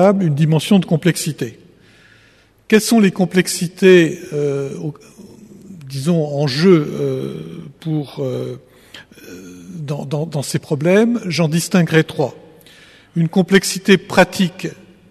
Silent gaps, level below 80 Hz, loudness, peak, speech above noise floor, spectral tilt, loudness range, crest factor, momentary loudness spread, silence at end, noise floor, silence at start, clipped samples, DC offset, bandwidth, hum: none; -56 dBFS; -16 LUFS; 0 dBFS; 35 dB; -5.5 dB/octave; 6 LU; 16 dB; 17 LU; 0.35 s; -51 dBFS; 0 s; under 0.1%; under 0.1%; 13.5 kHz; none